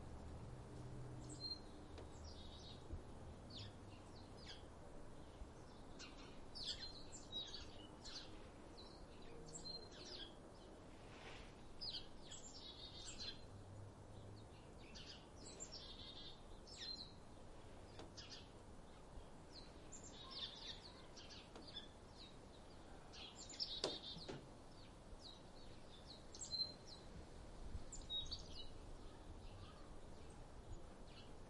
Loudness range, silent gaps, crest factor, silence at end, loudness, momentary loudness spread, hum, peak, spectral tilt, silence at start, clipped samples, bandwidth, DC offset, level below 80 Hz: 6 LU; none; 30 dB; 0 s; -54 LUFS; 13 LU; none; -24 dBFS; -3.5 dB/octave; 0 s; under 0.1%; 11 kHz; under 0.1%; -62 dBFS